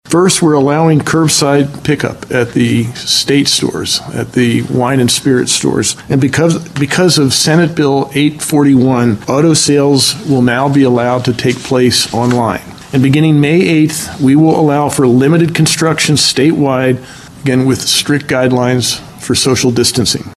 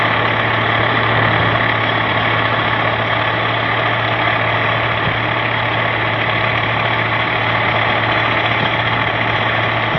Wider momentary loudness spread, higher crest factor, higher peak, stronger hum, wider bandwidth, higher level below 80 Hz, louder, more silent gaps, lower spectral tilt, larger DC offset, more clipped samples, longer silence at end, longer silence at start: first, 6 LU vs 2 LU; second, 10 dB vs 16 dB; about the same, 0 dBFS vs 0 dBFS; neither; first, 13 kHz vs 6.2 kHz; about the same, -44 dBFS vs -42 dBFS; first, -11 LUFS vs -15 LUFS; neither; second, -4.5 dB/octave vs -7 dB/octave; second, under 0.1% vs 0.1%; neither; about the same, 0 s vs 0 s; about the same, 0.05 s vs 0 s